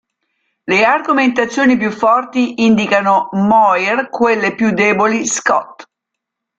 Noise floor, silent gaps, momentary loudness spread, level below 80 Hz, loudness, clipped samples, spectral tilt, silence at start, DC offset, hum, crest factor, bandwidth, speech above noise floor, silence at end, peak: -79 dBFS; none; 5 LU; -56 dBFS; -13 LUFS; under 0.1%; -4.5 dB/octave; 0.65 s; under 0.1%; none; 14 dB; 9 kHz; 66 dB; 0.75 s; 0 dBFS